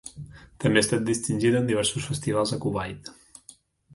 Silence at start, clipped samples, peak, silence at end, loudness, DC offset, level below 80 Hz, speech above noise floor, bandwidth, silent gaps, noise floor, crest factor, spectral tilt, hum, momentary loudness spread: 0.05 s; under 0.1%; -6 dBFS; 0.85 s; -25 LUFS; under 0.1%; -54 dBFS; 29 dB; 11.5 kHz; none; -54 dBFS; 20 dB; -4.5 dB/octave; none; 19 LU